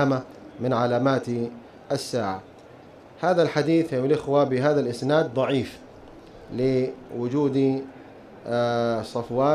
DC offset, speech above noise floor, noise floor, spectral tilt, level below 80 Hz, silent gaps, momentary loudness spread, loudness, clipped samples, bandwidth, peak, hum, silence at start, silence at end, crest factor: under 0.1%; 24 dB; -47 dBFS; -7 dB/octave; -58 dBFS; none; 14 LU; -24 LUFS; under 0.1%; 13.5 kHz; -8 dBFS; none; 0 s; 0 s; 16 dB